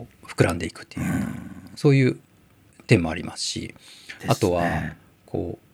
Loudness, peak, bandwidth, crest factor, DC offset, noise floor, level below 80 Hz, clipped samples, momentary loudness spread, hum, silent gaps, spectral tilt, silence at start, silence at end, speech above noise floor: -24 LUFS; -4 dBFS; 15.5 kHz; 22 dB; under 0.1%; -56 dBFS; -48 dBFS; under 0.1%; 18 LU; none; none; -6 dB/octave; 0 s; 0.15 s; 32 dB